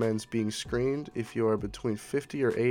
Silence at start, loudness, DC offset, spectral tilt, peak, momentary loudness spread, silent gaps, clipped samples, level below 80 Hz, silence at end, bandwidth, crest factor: 0 s; -31 LUFS; under 0.1%; -6 dB/octave; -16 dBFS; 5 LU; none; under 0.1%; -54 dBFS; 0 s; 17 kHz; 14 dB